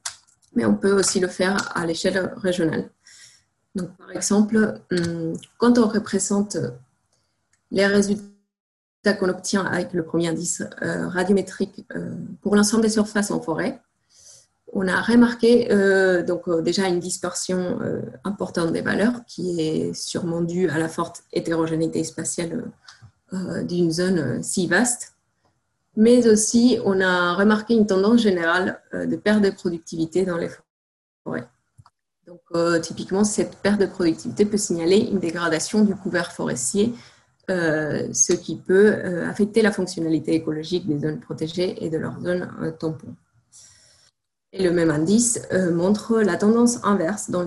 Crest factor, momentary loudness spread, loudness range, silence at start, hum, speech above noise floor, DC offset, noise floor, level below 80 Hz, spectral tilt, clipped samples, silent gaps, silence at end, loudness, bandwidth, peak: 18 dB; 12 LU; 6 LU; 0.05 s; none; 48 dB; under 0.1%; -69 dBFS; -58 dBFS; -4.5 dB/octave; under 0.1%; 8.60-9.03 s, 30.70-31.25 s; 0 s; -22 LUFS; 12.5 kHz; -4 dBFS